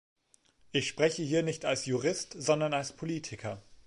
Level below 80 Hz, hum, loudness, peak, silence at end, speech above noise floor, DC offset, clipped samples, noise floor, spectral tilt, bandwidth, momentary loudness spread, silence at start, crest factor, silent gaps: -66 dBFS; none; -32 LUFS; -12 dBFS; 0.1 s; 35 dB; under 0.1%; under 0.1%; -66 dBFS; -4 dB/octave; 11.5 kHz; 9 LU; 0.75 s; 20 dB; none